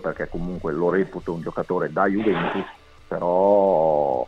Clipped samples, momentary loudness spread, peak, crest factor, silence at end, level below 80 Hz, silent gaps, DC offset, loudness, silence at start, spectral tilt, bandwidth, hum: under 0.1%; 12 LU; -6 dBFS; 16 dB; 0 s; -44 dBFS; none; under 0.1%; -22 LUFS; 0 s; -8.5 dB/octave; 7.8 kHz; none